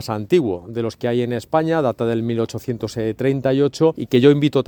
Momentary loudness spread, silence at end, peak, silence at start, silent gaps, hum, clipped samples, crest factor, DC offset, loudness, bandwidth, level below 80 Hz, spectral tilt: 10 LU; 0.05 s; 0 dBFS; 0 s; none; none; under 0.1%; 18 dB; under 0.1%; -19 LUFS; 19 kHz; -54 dBFS; -7 dB/octave